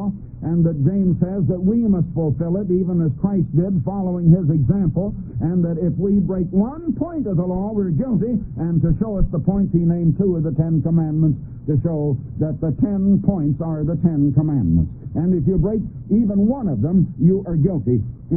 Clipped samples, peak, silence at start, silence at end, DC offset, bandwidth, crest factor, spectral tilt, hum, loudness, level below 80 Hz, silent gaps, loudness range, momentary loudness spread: under 0.1%; -4 dBFS; 0 s; 0 s; under 0.1%; 1.9 kHz; 16 dB; -17.5 dB/octave; none; -19 LUFS; -34 dBFS; none; 2 LU; 6 LU